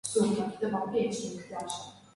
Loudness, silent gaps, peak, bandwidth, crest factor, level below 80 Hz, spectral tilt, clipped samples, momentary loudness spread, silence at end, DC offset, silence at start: -32 LUFS; none; -16 dBFS; 11.5 kHz; 16 dB; -68 dBFS; -5 dB/octave; under 0.1%; 11 LU; 0.15 s; under 0.1%; 0.05 s